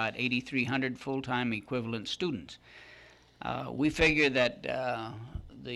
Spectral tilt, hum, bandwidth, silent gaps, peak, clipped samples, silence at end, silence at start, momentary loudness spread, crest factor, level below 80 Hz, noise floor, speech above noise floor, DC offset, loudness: -5 dB/octave; none; 12.5 kHz; none; -12 dBFS; under 0.1%; 0 s; 0 s; 19 LU; 20 dB; -52 dBFS; -57 dBFS; 25 dB; under 0.1%; -31 LUFS